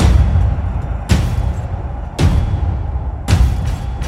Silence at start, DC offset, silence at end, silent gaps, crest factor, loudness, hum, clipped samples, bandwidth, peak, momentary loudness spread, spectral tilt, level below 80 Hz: 0 s; under 0.1%; 0 s; none; 14 dB; -17 LUFS; none; under 0.1%; 13 kHz; 0 dBFS; 8 LU; -6.5 dB/octave; -18 dBFS